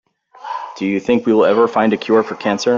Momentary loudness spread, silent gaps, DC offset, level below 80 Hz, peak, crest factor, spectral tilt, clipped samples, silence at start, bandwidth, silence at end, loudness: 14 LU; none; under 0.1%; -58 dBFS; -2 dBFS; 14 dB; -5.5 dB/octave; under 0.1%; 0.4 s; 7.6 kHz; 0 s; -15 LUFS